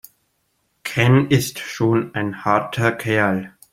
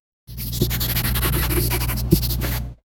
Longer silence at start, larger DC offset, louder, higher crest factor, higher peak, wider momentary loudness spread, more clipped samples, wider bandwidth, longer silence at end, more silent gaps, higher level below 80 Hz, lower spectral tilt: first, 0.85 s vs 0.3 s; neither; first, -19 LUFS vs -22 LUFS; about the same, 18 dB vs 22 dB; about the same, -2 dBFS vs 0 dBFS; about the same, 10 LU vs 9 LU; neither; second, 16.5 kHz vs 18.5 kHz; about the same, 0.25 s vs 0.25 s; neither; second, -54 dBFS vs -26 dBFS; first, -6 dB/octave vs -4.5 dB/octave